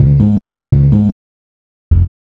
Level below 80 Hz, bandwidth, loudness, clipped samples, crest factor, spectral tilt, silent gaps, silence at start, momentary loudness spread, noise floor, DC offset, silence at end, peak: -22 dBFS; 2.4 kHz; -12 LUFS; 0.3%; 12 dB; -12 dB/octave; 1.12-1.91 s; 0 s; 7 LU; under -90 dBFS; under 0.1%; 0.15 s; 0 dBFS